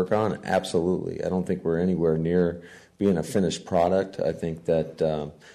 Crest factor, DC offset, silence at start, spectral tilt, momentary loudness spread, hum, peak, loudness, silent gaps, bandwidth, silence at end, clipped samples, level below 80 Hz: 14 dB; under 0.1%; 0 s; -6.5 dB/octave; 5 LU; none; -10 dBFS; -25 LUFS; none; 13.5 kHz; 0.05 s; under 0.1%; -52 dBFS